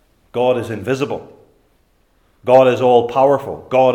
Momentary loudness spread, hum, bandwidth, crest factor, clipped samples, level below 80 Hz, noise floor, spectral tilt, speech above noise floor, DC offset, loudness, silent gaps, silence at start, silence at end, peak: 14 LU; none; 12.5 kHz; 16 dB; under 0.1%; -58 dBFS; -58 dBFS; -6.5 dB/octave; 44 dB; under 0.1%; -15 LUFS; none; 0.35 s; 0 s; 0 dBFS